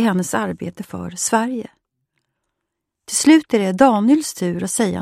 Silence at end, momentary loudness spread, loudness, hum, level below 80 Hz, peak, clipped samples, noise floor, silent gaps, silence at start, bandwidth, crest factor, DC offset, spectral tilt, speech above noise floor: 0 s; 16 LU; -17 LUFS; none; -56 dBFS; 0 dBFS; under 0.1%; -79 dBFS; none; 0 s; 15.5 kHz; 18 dB; under 0.1%; -4.5 dB/octave; 62 dB